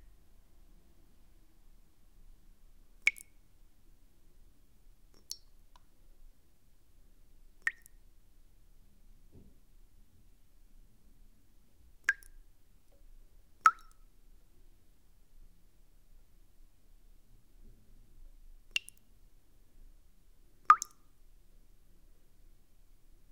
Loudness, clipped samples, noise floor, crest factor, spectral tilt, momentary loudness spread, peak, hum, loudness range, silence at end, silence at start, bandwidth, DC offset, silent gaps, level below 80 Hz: -32 LUFS; under 0.1%; -65 dBFS; 34 dB; 0.5 dB/octave; 27 LU; -6 dBFS; none; 12 LU; 2.55 s; 3.05 s; 16 kHz; under 0.1%; none; -60 dBFS